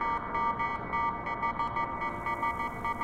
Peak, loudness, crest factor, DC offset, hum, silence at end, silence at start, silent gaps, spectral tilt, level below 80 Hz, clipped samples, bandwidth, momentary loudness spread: -18 dBFS; -32 LUFS; 14 dB; under 0.1%; none; 0 s; 0 s; none; -6 dB/octave; -50 dBFS; under 0.1%; 15.5 kHz; 3 LU